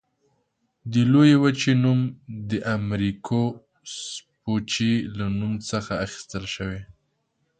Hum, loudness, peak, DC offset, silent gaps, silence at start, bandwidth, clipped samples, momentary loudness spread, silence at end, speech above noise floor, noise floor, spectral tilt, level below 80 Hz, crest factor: none; -23 LUFS; -6 dBFS; under 0.1%; none; 0.85 s; 9.2 kHz; under 0.1%; 17 LU; 0.75 s; 50 dB; -72 dBFS; -6 dB/octave; -52 dBFS; 18 dB